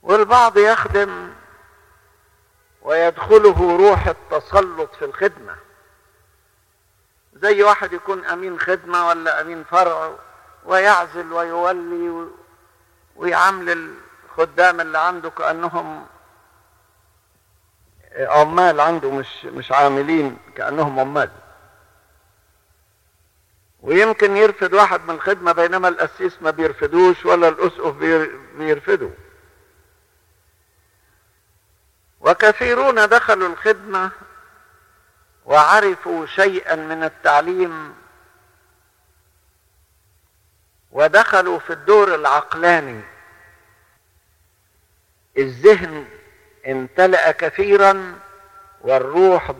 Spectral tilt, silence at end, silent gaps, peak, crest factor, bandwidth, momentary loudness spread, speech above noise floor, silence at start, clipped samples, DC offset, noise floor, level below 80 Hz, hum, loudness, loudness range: -5 dB/octave; 0.05 s; none; 0 dBFS; 18 dB; 13 kHz; 14 LU; 44 dB; 0.05 s; under 0.1%; under 0.1%; -60 dBFS; -44 dBFS; none; -16 LUFS; 7 LU